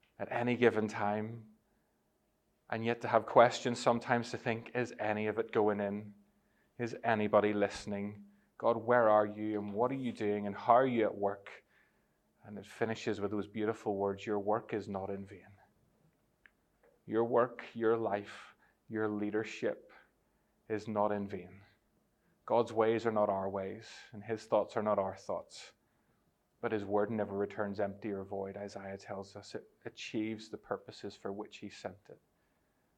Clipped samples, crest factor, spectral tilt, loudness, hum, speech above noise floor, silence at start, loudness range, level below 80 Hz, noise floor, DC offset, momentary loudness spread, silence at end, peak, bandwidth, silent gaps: under 0.1%; 26 dB; -6 dB/octave; -34 LUFS; none; 43 dB; 0.2 s; 8 LU; -76 dBFS; -77 dBFS; under 0.1%; 18 LU; 0.8 s; -10 dBFS; 10 kHz; none